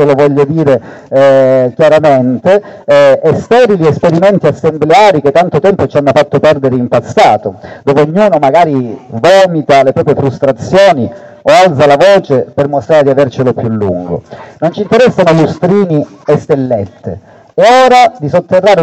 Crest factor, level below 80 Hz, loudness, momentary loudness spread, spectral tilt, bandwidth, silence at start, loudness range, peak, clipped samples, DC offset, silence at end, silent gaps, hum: 8 dB; -42 dBFS; -8 LUFS; 9 LU; -6.5 dB/octave; 10 kHz; 0 s; 3 LU; 0 dBFS; 2%; under 0.1%; 0 s; none; none